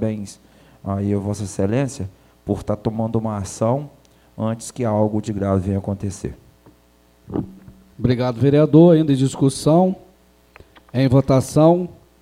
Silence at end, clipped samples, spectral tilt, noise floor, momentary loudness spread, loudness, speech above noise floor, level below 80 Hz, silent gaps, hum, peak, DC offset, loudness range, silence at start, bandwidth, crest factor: 0.3 s; under 0.1%; -7.5 dB/octave; -55 dBFS; 17 LU; -19 LUFS; 37 dB; -48 dBFS; none; none; 0 dBFS; under 0.1%; 8 LU; 0 s; 15 kHz; 20 dB